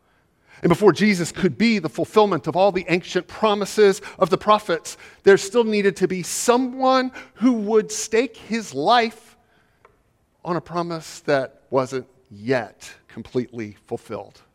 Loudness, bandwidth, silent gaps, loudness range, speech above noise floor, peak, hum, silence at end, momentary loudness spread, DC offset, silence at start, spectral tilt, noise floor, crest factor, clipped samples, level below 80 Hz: -20 LUFS; 15.5 kHz; none; 7 LU; 43 dB; -2 dBFS; none; 0.3 s; 15 LU; under 0.1%; 0.6 s; -4.5 dB/octave; -63 dBFS; 20 dB; under 0.1%; -58 dBFS